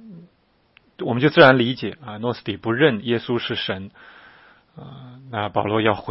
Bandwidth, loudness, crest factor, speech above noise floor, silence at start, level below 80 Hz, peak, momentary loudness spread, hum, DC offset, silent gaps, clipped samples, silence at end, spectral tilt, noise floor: 5.8 kHz; -20 LUFS; 22 dB; 41 dB; 0.05 s; -60 dBFS; 0 dBFS; 24 LU; none; under 0.1%; none; under 0.1%; 0 s; -8.5 dB/octave; -62 dBFS